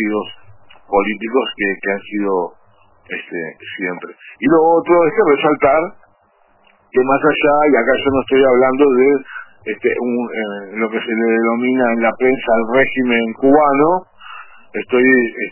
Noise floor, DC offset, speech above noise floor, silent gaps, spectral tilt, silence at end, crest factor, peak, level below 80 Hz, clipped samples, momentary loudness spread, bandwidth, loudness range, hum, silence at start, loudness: -55 dBFS; under 0.1%; 40 dB; none; -9.5 dB/octave; 0 s; 16 dB; 0 dBFS; -50 dBFS; under 0.1%; 15 LU; 3.1 kHz; 6 LU; none; 0 s; -15 LUFS